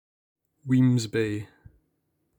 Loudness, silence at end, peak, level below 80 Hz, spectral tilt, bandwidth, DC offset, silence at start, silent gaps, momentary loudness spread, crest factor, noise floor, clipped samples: -25 LUFS; 0.95 s; -12 dBFS; -64 dBFS; -7 dB/octave; 18.5 kHz; under 0.1%; 0.65 s; none; 21 LU; 16 dB; -74 dBFS; under 0.1%